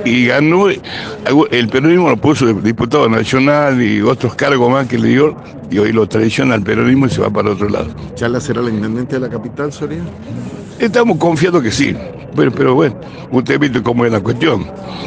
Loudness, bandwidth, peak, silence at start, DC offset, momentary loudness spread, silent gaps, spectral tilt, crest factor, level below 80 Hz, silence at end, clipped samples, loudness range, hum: -13 LUFS; 9.6 kHz; 0 dBFS; 0 s; under 0.1%; 11 LU; none; -6.5 dB/octave; 12 dB; -44 dBFS; 0 s; under 0.1%; 5 LU; none